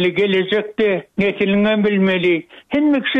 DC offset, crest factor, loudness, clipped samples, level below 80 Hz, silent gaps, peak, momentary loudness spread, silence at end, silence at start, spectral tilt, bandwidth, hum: under 0.1%; 10 dB; -17 LUFS; under 0.1%; -54 dBFS; none; -8 dBFS; 5 LU; 0 s; 0 s; -8 dB/octave; 5.8 kHz; none